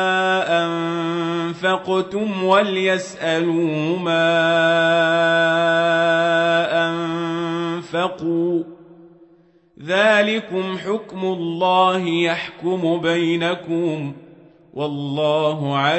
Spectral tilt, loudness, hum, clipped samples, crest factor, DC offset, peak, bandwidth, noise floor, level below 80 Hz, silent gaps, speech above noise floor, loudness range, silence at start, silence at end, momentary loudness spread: -5.5 dB/octave; -19 LUFS; none; under 0.1%; 16 dB; under 0.1%; -4 dBFS; 8.4 kHz; -54 dBFS; -66 dBFS; none; 35 dB; 5 LU; 0 s; 0 s; 8 LU